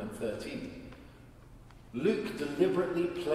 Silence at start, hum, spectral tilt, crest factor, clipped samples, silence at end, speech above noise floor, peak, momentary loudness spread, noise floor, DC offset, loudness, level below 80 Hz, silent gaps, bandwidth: 0 s; none; -6.5 dB/octave; 20 dB; under 0.1%; 0 s; 21 dB; -14 dBFS; 20 LU; -53 dBFS; under 0.1%; -33 LUFS; -58 dBFS; none; 14.5 kHz